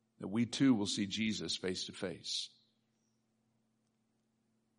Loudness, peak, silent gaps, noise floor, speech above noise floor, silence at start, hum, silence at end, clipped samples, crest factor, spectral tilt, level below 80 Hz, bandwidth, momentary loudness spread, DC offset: -36 LUFS; -20 dBFS; none; -79 dBFS; 44 dB; 0.2 s; none; 2.3 s; under 0.1%; 20 dB; -4 dB/octave; -78 dBFS; 10.5 kHz; 10 LU; under 0.1%